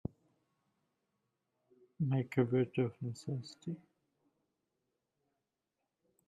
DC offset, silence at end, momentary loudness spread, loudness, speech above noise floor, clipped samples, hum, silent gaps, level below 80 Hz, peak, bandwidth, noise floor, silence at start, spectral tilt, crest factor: under 0.1%; 2.5 s; 13 LU; -37 LUFS; 52 dB; under 0.1%; none; none; -72 dBFS; -18 dBFS; 9.4 kHz; -88 dBFS; 2 s; -8 dB/octave; 22 dB